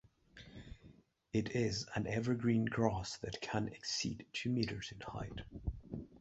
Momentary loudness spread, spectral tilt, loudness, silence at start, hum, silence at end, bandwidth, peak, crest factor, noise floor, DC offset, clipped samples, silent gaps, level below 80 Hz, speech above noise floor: 20 LU; -5 dB/octave; -39 LUFS; 0.35 s; none; 0 s; 8 kHz; -16 dBFS; 22 dB; -63 dBFS; under 0.1%; under 0.1%; none; -56 dBFS; 25 dB